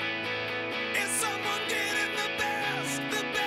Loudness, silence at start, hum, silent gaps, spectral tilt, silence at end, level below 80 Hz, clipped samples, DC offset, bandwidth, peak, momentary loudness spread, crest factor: -29 LUFS; 0 s; none; none; -2 dB/octave; 0 s; -68 dBFS; under 0.1%; under 0.1%; 16 kHz; -16 dBFS; 4 LU; 14 dB